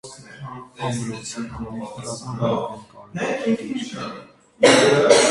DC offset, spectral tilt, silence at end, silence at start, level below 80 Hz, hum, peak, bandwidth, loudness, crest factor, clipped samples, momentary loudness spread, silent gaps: under 0.1%; -3.5 dB/octave; 0 s; 0.05 s; -54 dBFS; none; 0 dBFS; 11.5 kHz; -21 LUFS; 20 dB; under 0.1%; 22 LU; none